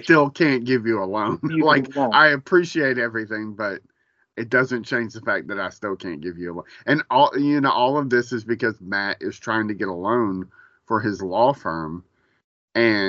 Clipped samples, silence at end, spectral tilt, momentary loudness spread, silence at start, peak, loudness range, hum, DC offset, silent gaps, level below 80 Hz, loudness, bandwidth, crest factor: under 0.1%; 0 s; -3.5 dB/octave; 14 LU; 0 s; 0 dBFS; 6 LU; none; under 0.1%; 12.44-12.68 s; -66 dBFS; -21 LUFS; 7.6 kHz; 20 dB